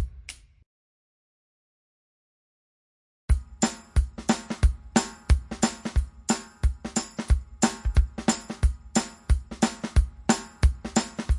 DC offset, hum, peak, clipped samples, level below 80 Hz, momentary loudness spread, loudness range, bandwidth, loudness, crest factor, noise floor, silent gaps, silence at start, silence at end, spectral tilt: under 0.1%; none; -6 dBFS; under 0.1%; -30 dBFS; 6 LU; 6 LU; 11.5 kHz; -27 LUFS; 20 dB; -46 dBFS; 0.66-3.28 s; 0 s; 0 s; -4.5 dB/octave